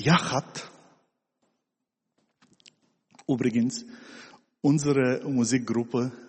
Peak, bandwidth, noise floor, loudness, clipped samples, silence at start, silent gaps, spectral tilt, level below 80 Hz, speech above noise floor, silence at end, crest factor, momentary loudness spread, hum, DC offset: -8 dBFS; 8.8 kHz; -84 dBFS; -26 LUFS; under 0.1%; 0 s; none; -5.5 dB/octave; -64 dBFS; 58 dB; 0.05 s; 20 dB; 22 LU; none; under 0.1%